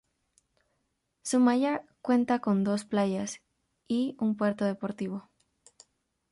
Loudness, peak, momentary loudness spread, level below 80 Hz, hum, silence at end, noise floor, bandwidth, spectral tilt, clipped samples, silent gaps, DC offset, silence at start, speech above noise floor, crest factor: -29 LUFS; -12 dBFS; 12 LU; -72 dBFS; none; 1.1 s; -78 dBFS; 11.5 kHz; -6 dB/octave; under 0.1%; none; under 0.1%; 1.25 s; 51 dB; 18 dB